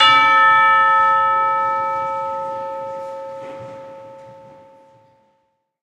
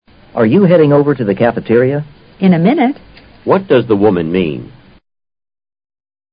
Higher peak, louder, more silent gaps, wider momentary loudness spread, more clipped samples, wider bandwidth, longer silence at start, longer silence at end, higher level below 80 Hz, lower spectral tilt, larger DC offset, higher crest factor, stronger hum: about the same, 0 dBFS vs 0 dBFS; second, -15 LUFS vs -12 LUFS; neither; first, 23 LU vs 14 LU; neither; first, 10 kHz vs 5.2 kHz; second, 0 s vs 0.35 s; second, 1.5 s vs 1.65 s; second, -68 dBFS vs -46 dBFS; second, -2.5 dB/octave vs -13.5 dB/octave; neither; first, 18 dB vs 12 dB; neither